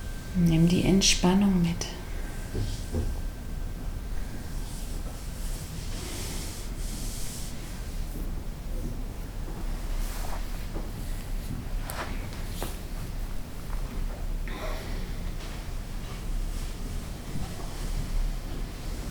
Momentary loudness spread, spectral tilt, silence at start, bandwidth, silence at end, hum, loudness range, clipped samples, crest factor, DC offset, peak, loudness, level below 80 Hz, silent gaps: 16 LU; -4.5 dB/octave; 0 s; over 20 kHz; 0 s; none; 10 LU; under 0.1%; 20 dB; under 0.1%; -8 dBFS; -32 LUFS; -34 dBFS; none